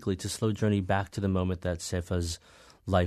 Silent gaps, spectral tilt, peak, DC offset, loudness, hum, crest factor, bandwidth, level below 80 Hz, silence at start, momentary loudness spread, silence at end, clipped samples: none; -6 dB/octave; -10 dBFS; under 0.1%; -30 LUFS; none; 20 dB; 13.5 kHz; -48 dBFS; 0 s; 7 LU; 0 s; under 0.1%